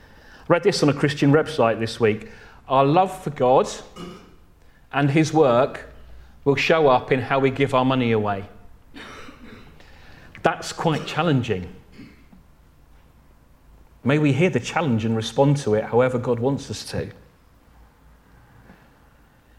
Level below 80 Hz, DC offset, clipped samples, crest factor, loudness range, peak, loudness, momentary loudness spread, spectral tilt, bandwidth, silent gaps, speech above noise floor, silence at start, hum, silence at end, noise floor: -52 dBFS; under 0.1%; under 0.1%; 22 dB; 7 LU; -2 dBFS; -21 LUFS; 19 LU; -6 dB/octave; 13.5 kHz; none; 34 dB; 0.5 s; none; 2.45 s; -54 dBFS